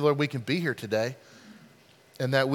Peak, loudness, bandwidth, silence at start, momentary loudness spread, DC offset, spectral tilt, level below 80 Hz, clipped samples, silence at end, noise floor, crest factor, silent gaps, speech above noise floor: -10 dBFS; -29 LUFS; 17 kHz; 0 s; 15 LU; under 0.1%; -6 dB/octave; -76 dBFS; under 0.1%; 0 s; -57 dBFS; 20 dB; none; 30 dB